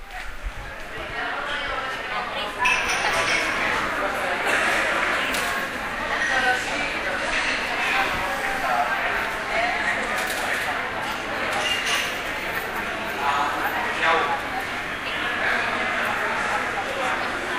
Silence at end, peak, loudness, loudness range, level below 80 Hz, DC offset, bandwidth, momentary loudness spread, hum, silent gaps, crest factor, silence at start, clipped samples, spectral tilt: 0 s; -8 dBFS; -23 LUFS; 2 LU; -44 dBFS; under 0.1%; 16 kHz; 7 LU; none; none; 18 dB; 0 s; under 0.1%; -2 dB/octave